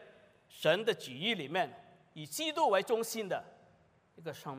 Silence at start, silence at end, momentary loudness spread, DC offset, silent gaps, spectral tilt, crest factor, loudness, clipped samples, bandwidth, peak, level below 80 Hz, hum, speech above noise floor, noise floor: 0 s; 0 s; 16 LU; under 0.1%; none; -3.5 dB/octave; 20 dB; -34 LUFS; under 0.1%; 15.5 kHz; -16 dBFS; -84 dBFS; none; 33 dB; -67 dBFS